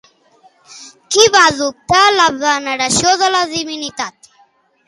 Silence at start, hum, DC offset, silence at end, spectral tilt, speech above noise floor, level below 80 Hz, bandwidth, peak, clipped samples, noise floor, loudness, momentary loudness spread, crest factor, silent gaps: 0.7 s; none; under 0.1%; 0.8 s; -1.5 dB/octave; 41 dB; -48 dBFS; 16 kHz; 0 dBFS; under 0.1%; -54 dBFS; -12 LUFS; 13 LU; 16 dB; none